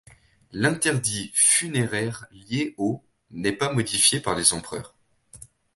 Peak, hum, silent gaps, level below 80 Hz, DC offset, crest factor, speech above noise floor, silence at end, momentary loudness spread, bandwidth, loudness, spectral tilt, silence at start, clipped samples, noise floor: -2 dBFS; none; none; -56 dBFS; under 0.1%; 24 dB; 29 dB; 0.4 s; 18 LU; 12 kHz; -22 LUFS; -2.5 dB/octave; 0.55 s; under 0.1%; -54 dBFS